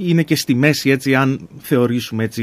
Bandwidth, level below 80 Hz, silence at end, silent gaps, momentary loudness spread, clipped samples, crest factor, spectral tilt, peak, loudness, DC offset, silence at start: 15.5 kHz; -56 dBFS; 0 s; none; 6 LU; under 0.1%; 16 dB; -5.5 dB/octave; 0 dBFS; -17 LUFS; under 0.1%; 0 s